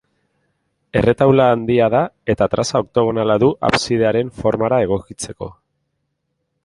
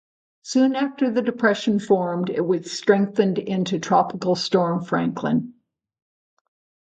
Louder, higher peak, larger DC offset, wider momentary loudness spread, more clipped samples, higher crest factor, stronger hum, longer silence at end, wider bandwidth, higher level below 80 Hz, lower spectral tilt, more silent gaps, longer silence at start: first, -16 LUFS vs -22 LUFS; about the same, 0 dBFS vs -2 dBFS; neither; first, 10 LU vs 5 LU; neither; about the same, 18 dB vs 20 dB; neither; second, 1.1 s vs 1.35 s; first, 11.5 kHz vs 9 kHz; first, -44 dBFS vs -66 dBFS; about the same, -6 dB/octave vs -6 dB/octave; neither; first, 0.95 s vs 0.45 s